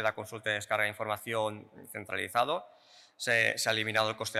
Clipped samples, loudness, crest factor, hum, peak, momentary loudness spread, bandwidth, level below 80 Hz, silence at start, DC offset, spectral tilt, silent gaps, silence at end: under 0.1%; -31 LUFS; 18 dB; none; -14 dBFS; 11 LU; 16 kHz; -76 dBFS; 0 s; under 0.1%; -2.5 dB/octave; none; 0 s